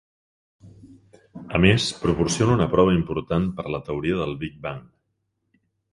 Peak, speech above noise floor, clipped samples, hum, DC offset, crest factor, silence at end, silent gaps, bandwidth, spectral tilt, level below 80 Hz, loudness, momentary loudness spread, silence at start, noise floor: 0 dBFS; 53 dB; under 0.1%; none; under 0.1%; 24 dB; 1.1 s; none; 11.5 kHz; -5.5 dB/octave; -42 dBFS; -22 LUFS; 14 LU; 0.65 s; -75 dBFS